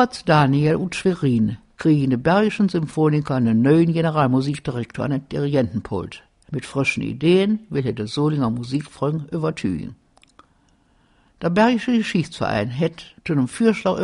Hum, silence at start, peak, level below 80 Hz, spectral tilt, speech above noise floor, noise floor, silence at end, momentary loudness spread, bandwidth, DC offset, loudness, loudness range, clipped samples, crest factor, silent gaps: none; 0 s; -2 dBFS; -50 dBFS; -7 dB/octave; 40 dB; -59 dBFS; 0 s; 10 LU; 11 kHz; under 0.1%; -20 LUFS; 6 LU; under 0.1%; 18 dB; none